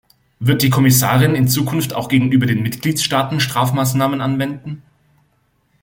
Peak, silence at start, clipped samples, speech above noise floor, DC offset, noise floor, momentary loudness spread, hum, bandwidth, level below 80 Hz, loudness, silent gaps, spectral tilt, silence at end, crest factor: -2 dBFS; 0.4 s; under 0.1%; 46 dB; under 0.1%; -61 dBFS; 9 LU; none; 17 kHz; -50 dBFS; -16 LUFS; none; -5 dB/octave; 1.05 s; 16 dB